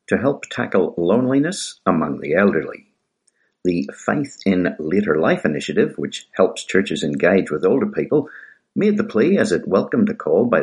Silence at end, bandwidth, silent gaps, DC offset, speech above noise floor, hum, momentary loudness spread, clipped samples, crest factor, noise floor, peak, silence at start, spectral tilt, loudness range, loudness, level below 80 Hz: 0 s; 11.5 kHz; none; under 0.1%; 48 dB; none; 6 LU; under 0.1%; 18 dB; -66 dBFS; -2 dBFS; 0.1 s; -6 dB/octave; 3 LU; -19 LUFS; -58 dBFS